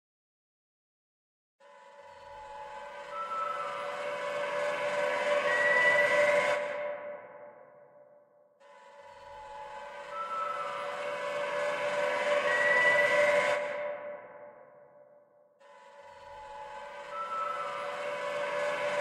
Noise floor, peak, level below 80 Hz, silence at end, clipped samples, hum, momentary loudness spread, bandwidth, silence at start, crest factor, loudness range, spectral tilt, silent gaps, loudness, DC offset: -62 dBFS; -14 dBFS; -76 dBFS; 0 s; under 0.1%; none; 22 LU; 12 kHz; 1.65 s; 18 dB; 17 LU; -2 dB/octave; none; -30 LUFS; under 0.1%